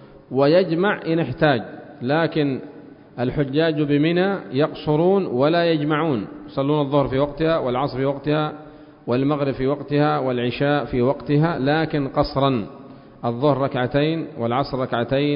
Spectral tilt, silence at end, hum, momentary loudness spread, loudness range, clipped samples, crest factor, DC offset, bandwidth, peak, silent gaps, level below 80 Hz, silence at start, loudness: -12 dB/octave; 0 s; none; 9 LU; 2 LU; under 0.1%; 16 dB; under 0.1%; 5.4 kHz; -4 dBFS; none; -48 dBFS; 0 s; -21 LUFS